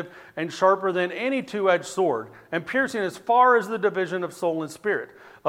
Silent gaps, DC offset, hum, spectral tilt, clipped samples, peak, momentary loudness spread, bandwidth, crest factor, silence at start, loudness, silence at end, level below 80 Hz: none; under 0.1%; none; -5 dB/octave; under 0.1%; -6 dBFS; 12 LU; 15.5 kHz; 18 dB; 0 s; -24 LUFS; 0 s; -72 dBFS